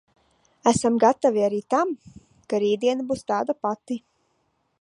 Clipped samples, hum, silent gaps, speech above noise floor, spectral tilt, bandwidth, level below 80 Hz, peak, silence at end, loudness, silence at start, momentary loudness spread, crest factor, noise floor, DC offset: under 0.1%; none; none; 48 dB; -5 dB/octave; 11.5 kHz; -60 dBFS; -4 dBFS; 0.85 s; -23 LUFS; 0.65 s; 11 LU; 20 dB; -70 dBFS; under 0.1%